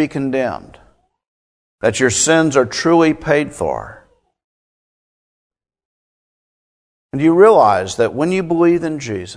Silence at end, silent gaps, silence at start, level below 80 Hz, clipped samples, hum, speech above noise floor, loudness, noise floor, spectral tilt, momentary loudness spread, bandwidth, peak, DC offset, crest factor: 0 s; 1.28-1.78 s, 4.44-5.50 s, 5.85-7.09 s; 0 s; -50 dBFS; under 0.1%; none; over 76 dB; -15 LUFS; under -90 dBFS; -4.5 dB/octave; 12 LU; 11 kHz; 0 dBFS; under 0.1%; 16 dB